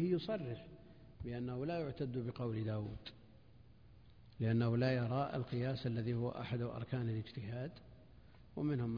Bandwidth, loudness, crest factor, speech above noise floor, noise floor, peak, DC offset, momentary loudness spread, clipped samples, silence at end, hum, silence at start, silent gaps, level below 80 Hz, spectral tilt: 5.2 kHz; -40 LUFS; 16 dB; 24 dB; -63 dBFS; -24 dBFS; under 0.1%; 16 LU; under 0.1%; 0 s; none; 0 s; none; -64 dBFS; -7 dB/octave